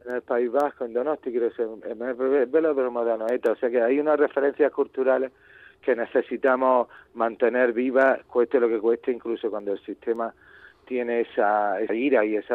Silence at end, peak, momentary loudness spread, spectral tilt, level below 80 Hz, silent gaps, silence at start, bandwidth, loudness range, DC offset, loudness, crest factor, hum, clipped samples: 0 s; -8 dBFS; 9 LU; -7 dB/octave; -70 dBFS; none; 0.05 s; 4.5 kHz; 4 LU; under 0.1%; -24 LUFS; 16 dB; none; under 0.1%